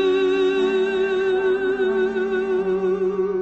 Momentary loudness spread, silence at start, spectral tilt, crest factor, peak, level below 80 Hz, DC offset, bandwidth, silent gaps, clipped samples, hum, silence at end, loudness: 3 LU; 0 s; -6 dB/octave; 10 dB; -10 dBFS; -54 dBFS; under 0.1%; 7.8 kHz; none; under 0.1%; none; 0 s; -21 LUFS